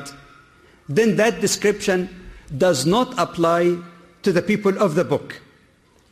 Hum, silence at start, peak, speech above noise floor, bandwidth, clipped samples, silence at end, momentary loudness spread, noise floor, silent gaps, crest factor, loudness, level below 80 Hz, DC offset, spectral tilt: none; 0 s; -6 dBFS; 37 dB; 15 kHz; under 0.1%; 0.75 s; 13 LU; -56 dBFS; none; 14 dB; -20 LUFS; -52 dBFS; under 0.1%; -5 dB/octave